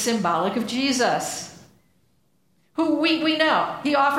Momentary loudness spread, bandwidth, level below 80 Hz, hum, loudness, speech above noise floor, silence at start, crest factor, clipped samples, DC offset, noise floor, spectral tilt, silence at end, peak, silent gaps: 11 LU; 16 kHz; -66 dBFS; none; -22 LUFS; 45 dB; 0 s; 18 dB; under 0.1%; under 0.1%; -66 dBFS; -3 dB/octave; 0 s; -6 dBFS; none